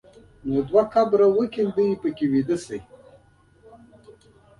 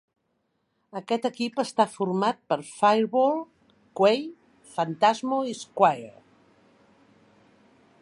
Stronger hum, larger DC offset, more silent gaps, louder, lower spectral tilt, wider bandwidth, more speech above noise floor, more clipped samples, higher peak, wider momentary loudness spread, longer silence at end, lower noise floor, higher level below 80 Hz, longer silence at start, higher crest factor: neither; neither; neither; first, -22 LUFS vs -25 LUFS; first, -7.5 dB/octave vs -5 dB/octave; about the same, 11 kHz vs 11.5 kHz; second, 35 dB vs 50 dB; neither; about the same, -6 dBFS vs -6 dBFS; second, 13 LU vs 17 LU; second, 0.5 s vs 1.9 s; second, -56 dBFS vs -74 dBFS; first, -56 dBFS vs -78 dBFS; second, 0.45 s vs 0.95 s; about the same, 18 dB vs 22 dB